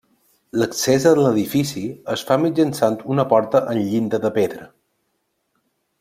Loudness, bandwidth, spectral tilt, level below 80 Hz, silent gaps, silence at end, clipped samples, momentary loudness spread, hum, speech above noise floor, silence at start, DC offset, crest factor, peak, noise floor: -19 LUFS; 16 kHz; -5.5 dB/octave; -60 dBFS; none; 1.35 s; under 0.1%; 10 LU; none; 53 dB; 0.55 s; under 0.1%; 18 dB; -2 dBFS; -71 dBFS